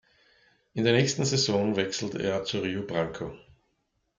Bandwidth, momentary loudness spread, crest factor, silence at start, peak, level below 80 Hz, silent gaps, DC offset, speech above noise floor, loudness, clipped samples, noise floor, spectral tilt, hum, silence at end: 9.6 kHz; 11 LU; 20 dB; 0.75 s; -10 dBFS; -62 dBFS; none; under 0.1%; 48 dB; -27 LUFS; under 0.1%; -75 dBFS; -4.5 dB/octave; none; 0.8 s